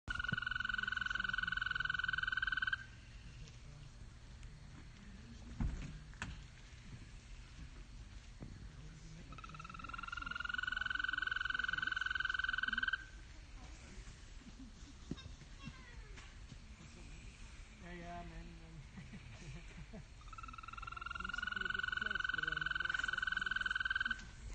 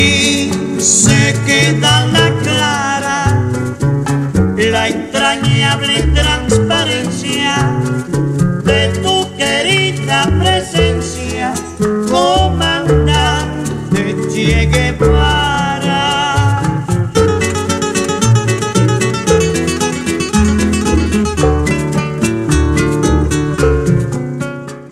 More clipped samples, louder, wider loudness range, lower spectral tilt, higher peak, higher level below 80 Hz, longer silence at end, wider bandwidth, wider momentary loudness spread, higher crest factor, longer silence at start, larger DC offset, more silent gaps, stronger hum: neither; second, -40 LUFS vs -13 LUFS; first, 16 LU vs 2 LU; second, -3 dB/octave vs -4.5 dB/octave; second, -26 dBFS vs 0 dBFS; second, -54 dBFS vs -24 dBFS; about the same, 0 s vs 0 s; second, 9.4 kHz vs 14.5 kHz; first, 19 LU vs 6 LU; first, 18 dB vs 12 dB; about the same, 0.05 s vs 0 s; neither; neither; neither